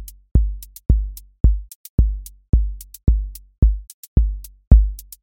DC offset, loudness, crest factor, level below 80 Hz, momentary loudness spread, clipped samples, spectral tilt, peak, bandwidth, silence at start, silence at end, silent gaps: under 0.1%; -21 LUFS; 18 dB; -18 dBFS; 15 LU; under 0.1%; -8.5 dB/octave; 0 dBFS; 17 kHz; 0 s; 0.2 s; 0.31-0.35 s, 1.40-1.44 s, 1.75-1.98 s, 2.49-2.53 s, 3.58-3.62 s, 3.94-4.16 s, 4.67-4.71 s